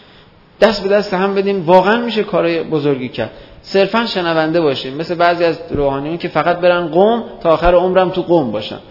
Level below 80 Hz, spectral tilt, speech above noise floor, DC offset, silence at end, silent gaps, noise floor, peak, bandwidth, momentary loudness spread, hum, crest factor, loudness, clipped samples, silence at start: -36 dBFS; -7 dB/octave; 30 dB; under 0.1%; 0 s; none; -44 dBFS; 0 dBFS; 6 kHz; 8 LU; none; 14 dB; -15 LUFS; 0.1%; 0.6 s